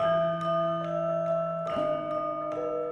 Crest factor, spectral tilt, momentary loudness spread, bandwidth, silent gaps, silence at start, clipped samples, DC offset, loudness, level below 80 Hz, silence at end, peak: 12 dB; -7.5 dB/octave; 4 LU; 7.2 kHz; none; 0 s; under 0.1%; under 0.1%; -29 LUFS; -64 dBFS; 0 s; -16 dBFS